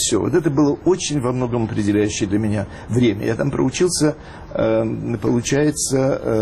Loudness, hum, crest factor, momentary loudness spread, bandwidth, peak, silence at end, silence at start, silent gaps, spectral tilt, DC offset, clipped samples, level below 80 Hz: -19 LUFS; none; 12 dB; 5 LU; 13 kHz; -6 dBFS; 0 s; 0 s; none; -5 dB/octave; under 0.1%; under 0.1%; -42 dBFS